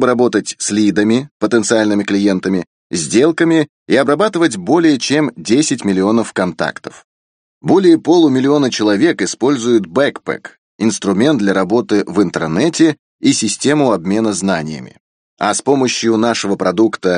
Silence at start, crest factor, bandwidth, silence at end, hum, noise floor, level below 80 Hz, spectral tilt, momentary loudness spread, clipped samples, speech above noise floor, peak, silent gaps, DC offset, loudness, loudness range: 0 s; 14 dB; 10 kHz; 0 s; none; under -90 dBFS; -56 dBFS; -4.5 dB/octave; 7 LU; under 0.1%; over 77 dB; 0 dBFS; 1.31-1.40 s, 2.67-2.90 s, 3.69-3.86 s, 7.04-7.61 s, 10.58-10.79 s, 12.99-13.19 s, 15.00-15.37 s; under 0.1%; -14 LUFS; 2 LU